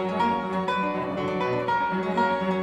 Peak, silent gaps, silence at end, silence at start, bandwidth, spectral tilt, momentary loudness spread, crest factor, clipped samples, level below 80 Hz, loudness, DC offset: -12 dBFS; none; 0 s; 0 s; 9.6 kHz; -7 dB/octave; 3 LU; 12 dB; under 0.1%; -62 dBFS; -26 LUFS; under 0.1%